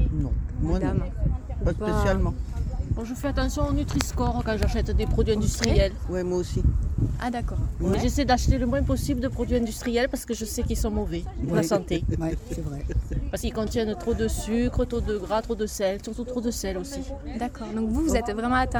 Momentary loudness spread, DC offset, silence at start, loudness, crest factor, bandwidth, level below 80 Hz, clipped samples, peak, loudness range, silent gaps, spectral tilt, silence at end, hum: 7 LU; under 0.1%; 0 s; -27 LUFS; 24 dB; over 20 kHz; -30 dBFS; under 0.1%; -2 dBFS; 3 LU; none; -6 dB/octave; 0 s; none